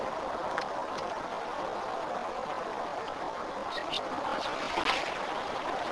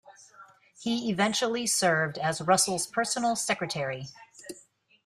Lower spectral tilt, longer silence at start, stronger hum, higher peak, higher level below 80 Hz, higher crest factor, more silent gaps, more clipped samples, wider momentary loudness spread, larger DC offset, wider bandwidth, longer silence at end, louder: about the same, -3 dB/octave vs -3 dB/octave; about the same, 0 s vs 0.05 s; neither; about the same, -10 dBFS vs -10 dBFS; first, -60 dBFS vs -70 dBFS; about the same, 24 dB vs 20 dB; neither; neither; second, 6 LU vs 21 LU; neither; second, 11 kHz vs 15.5 kHz; second, 0 s vs 0.45 s; second, -34 LUFS vs -27 LUFS